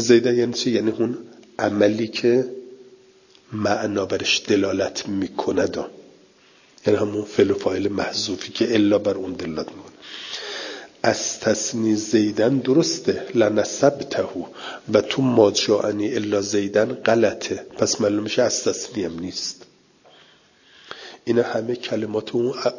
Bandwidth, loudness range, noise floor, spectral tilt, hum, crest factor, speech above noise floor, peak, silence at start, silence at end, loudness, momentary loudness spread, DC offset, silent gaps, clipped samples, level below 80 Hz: 7.4 kHz; 5 LU; -54 dBFS; -4 dB/octave; none; 20 dB; 33 dB; -2 dBFS; 0 s; 0 s; -21 LUFS; 13 LU; under 0.1%; none; under 0.1%; -56 dBFS